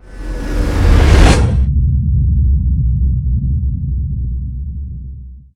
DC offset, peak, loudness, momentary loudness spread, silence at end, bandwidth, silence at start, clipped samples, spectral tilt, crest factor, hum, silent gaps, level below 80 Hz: under 0.1%; 0 dBFS; -15 LUFS; 17 LU; 0.15 s; 11.5 kHz; 0.05 s; 0.4%; -6.5 dB/octave; 12 dB; none; none; -14 dBFS